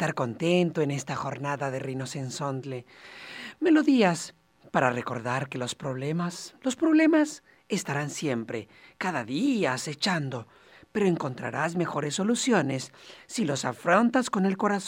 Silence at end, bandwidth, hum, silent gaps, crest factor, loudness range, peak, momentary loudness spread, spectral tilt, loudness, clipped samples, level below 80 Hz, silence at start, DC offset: 0 s; 16 kHz; none; none; 20 dB; 3 LU; -6 dBFS; 14 LU; -5 dB/octave; -27 LUFS; under 0.1%; -70 dBFS; 0 s; under 0.1%